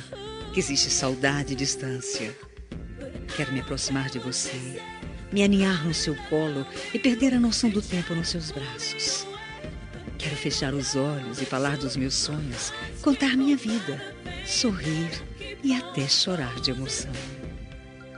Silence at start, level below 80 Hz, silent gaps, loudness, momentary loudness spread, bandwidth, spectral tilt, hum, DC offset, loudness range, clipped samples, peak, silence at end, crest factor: 0 s; -46 dBFS; none; -26 LUFS; 16 LU; 11 kHz; -3.5 dB/octave; none; under 0.1%; 4 LU; under 0.1%; -6 dBFS; 0 s; 20 dB